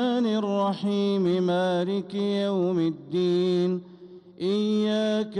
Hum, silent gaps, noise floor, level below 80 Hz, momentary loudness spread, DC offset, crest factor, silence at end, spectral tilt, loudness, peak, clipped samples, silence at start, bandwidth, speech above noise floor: none; none; -46 dBFS; -72 dBFS; 4 LU; under 0.1%; 10 dB; 0 s; -7 dB/octave; -25 LUFS; -16 dBFS; under 0.1%; 0 s; 10.5 kHz; 22 dB